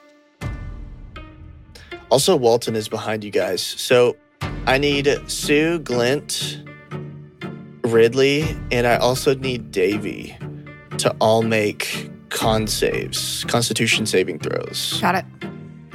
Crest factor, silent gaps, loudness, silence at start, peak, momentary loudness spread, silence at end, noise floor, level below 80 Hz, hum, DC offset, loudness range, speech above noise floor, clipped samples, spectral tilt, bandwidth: 18 dB; none; -19 LUFS; 0.4 s; -2 dBFS; 18 LU; 0 s; -41 dBFS; -42 dBFS; none; under 0.1%; 2 LU; 22 dB; under 0.1%; -4 dB/octave; 16.5 kHz